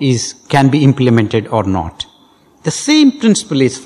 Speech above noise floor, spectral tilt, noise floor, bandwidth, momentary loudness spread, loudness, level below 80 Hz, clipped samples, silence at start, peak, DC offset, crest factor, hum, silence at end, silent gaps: 36 dB; -5.5 dB/octave; -48 dBFS; 12 kHz; 13 LU; -13 LUFS; -40 dBFS; 0.2%; 0 s; 0 dBFS; under 0.1%; 12 dB; none; 0 s; none